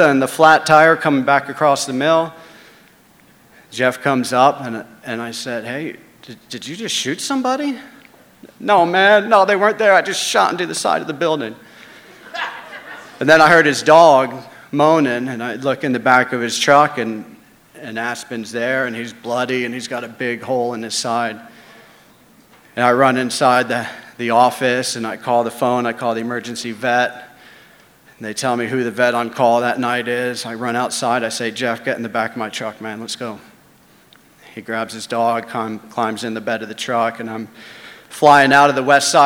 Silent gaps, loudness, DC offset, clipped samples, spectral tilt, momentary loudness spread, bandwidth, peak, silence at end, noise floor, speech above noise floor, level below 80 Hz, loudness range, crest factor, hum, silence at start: none; -16 LUFS; under 0.1%; under 0.1%; -3.5 dB/octave; 17 LU; 17 kHz; 0 dBFS; 0 s; -50 dBFS; 34 dB; -64 dBFS; 9 LU; 18 dB; none; 0 s